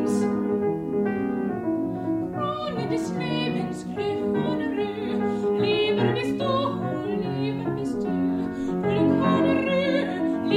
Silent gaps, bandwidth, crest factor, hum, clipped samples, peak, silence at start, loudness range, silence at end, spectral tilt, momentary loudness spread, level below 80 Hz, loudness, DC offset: none; 12 kHz; 16 dB; none; under 0.1%; -10 dBFS; 0 s; 3 LU; 0 s; -7 dB/octave; 6 LU; -56 dBFS; -25 LUFS; under 0.1%